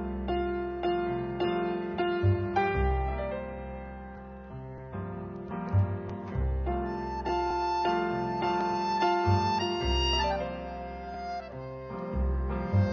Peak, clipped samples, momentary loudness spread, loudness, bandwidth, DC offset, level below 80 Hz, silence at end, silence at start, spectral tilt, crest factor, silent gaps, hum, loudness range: -14 dBFS; under 0.1%; 13 LU; -31 LUFS; 7 kHz; under 0.1%; -38 dBFS; 0 s; 0 s; -7 dB/octave; 16 dB; none; none; 6 LU